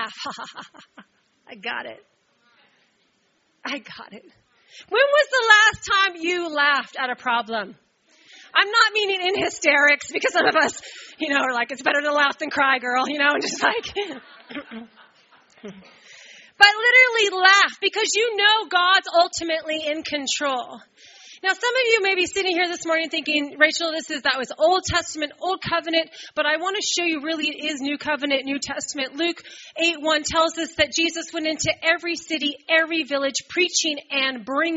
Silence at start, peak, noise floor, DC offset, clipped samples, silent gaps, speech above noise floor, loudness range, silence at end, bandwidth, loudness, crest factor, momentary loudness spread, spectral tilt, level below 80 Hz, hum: 0 s; 0 dBFS; -66 dBFS; under 0.1%; under 0.1%; none; 44 dB; 8 LU; 0 s; 8 kHz; -20 LUFS; 22 dB; 14 LU; 0.5 dB/octave; -60 dBFS; none